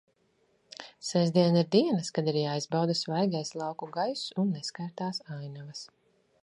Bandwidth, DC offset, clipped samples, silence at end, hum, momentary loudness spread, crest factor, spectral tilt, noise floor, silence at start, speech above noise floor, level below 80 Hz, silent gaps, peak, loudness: 11 kHz; under 0.1%; under 0.1%; 0.55 s; none; 18 LU; 20 dB; -6 dB/octave; -70 dBFS; 0.8 s; 41 dB; -78 dBFS; none; -10 dBFS; -29 LUFS